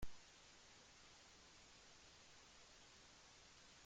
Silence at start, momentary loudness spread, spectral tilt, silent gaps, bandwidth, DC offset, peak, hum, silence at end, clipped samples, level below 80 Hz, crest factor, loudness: 0 s; 0 LU; -2 dB/octave; none; 16 kHz; under 0.1%; -36 dBFS; none; 0 s; under 0.1%; -68 dBFS; 22 dB; -64 LUFS